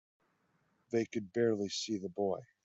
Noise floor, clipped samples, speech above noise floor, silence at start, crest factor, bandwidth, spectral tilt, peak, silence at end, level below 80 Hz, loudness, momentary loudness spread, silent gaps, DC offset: -76 dBFS; under 0.1%; 41 dB; 0.9 s; 18 dB; 8.2 kHz; -5 dB/octave; -20 dBFS; 0.2 s; -80 dBFS; -36 LUFS; 5 LU; none; under 0.1%